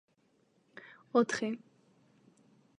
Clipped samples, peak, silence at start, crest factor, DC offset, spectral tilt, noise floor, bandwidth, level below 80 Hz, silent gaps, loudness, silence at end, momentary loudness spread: under 0.1%; -14 dBFS; 0.85 s; 24 dB; under 0.1%; -4.5 dB/octave; -72 dBFS; 10.5 kHz; -84 dBFS; none; -33 LUFS; 1.25 s; 24 LU